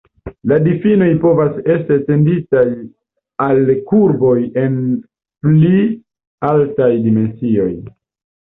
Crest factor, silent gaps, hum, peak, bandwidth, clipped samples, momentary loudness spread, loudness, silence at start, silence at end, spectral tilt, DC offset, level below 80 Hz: 12 dB; 6.27-6.38 s; none; -2 dBFS; 3.9 kHz; under 0.1%; 9 LU; -14 LUFS; 0.25 s; 0.55 s; -12.5 dB/octave; under 0.1%; -48 dBFS